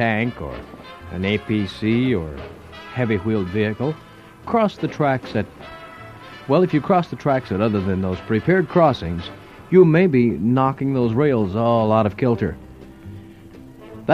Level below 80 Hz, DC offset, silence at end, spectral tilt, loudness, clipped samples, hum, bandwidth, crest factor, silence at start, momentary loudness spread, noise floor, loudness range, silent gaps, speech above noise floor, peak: -46 dBFS; under 0.1%; 0 s; -8.5 dB/octave; -20 LUFS; under 0.1%; none; 10.5 kHz; 18 dB; 0 s; 21 LU; -41 dBFS; 6 LU; none; 22 dB; -2 dBFS